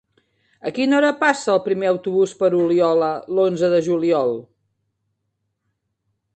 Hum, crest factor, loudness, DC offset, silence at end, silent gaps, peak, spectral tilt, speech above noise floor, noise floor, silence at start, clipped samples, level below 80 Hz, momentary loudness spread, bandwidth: none; 18 dB; -19 LUFS; under 0.1%; 1.95 s; none; -2 dBFS; -5.5 dB/octave; 56 dB; -74 dBFS; 0.65 s; under 0.1%; -66 dBFS; 6 LU; 9 kHz